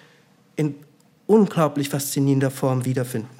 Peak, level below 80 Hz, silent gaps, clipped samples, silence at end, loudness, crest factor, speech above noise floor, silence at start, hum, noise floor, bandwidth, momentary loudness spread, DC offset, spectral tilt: -4 dBFS; -68 dBFS; none; under 0.1%; 0.1 s; -22 LUFS; 18 dB; 35 dB; 0.55 s; none; -56 dBFS; 16.5 kHz; 13 LU; under 0.1%; -6.5 dB/octave